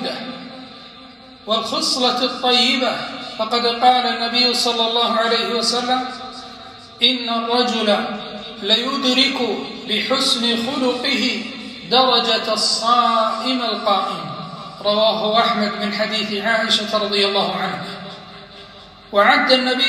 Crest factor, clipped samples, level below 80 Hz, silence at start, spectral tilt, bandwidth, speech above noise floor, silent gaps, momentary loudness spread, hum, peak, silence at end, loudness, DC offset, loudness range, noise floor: 18 dB; under 0.1%; -60 dBFS; 0 s; -2.5 dB/octave; 15 kHz; 23 dB; none; 17 LU; none; 0 dBFS; 0 s; -17 LUFS; under 0.1%; 3 LU; -41 dBFS